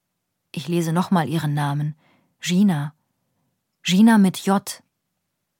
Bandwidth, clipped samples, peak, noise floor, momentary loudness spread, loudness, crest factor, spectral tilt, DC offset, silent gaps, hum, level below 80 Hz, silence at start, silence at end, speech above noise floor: 17 kHz; under 0.1%; -4 dBFS; -77 dBFS; 18 LU; -20 LUFS; 18 dB; -6 dB/octave; under 0.1%; none; none; -72 dBFS; 0.55 s; 0.85 s; 58 dB